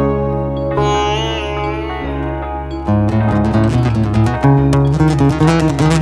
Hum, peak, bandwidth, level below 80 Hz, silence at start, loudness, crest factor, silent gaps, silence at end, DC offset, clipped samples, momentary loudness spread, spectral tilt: none; 0 dBFS; 11.5 kHz; -26 dBFS; 0 s; -15 LUFS; 14 dB; none; 0 s; under 0.1%; under 0.1%; 9 LU; -7 dB/octave